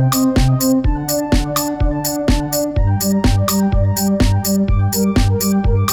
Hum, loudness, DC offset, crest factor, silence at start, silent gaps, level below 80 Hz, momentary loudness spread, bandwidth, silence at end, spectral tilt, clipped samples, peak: none; -16 LUFS; under 0.1%; 12 dB; 0 s; none; -22 dBFS; 4 LU; over 20 kHz; 0 s; -5.5 dB/octave; under 0.1%; -2 dBFS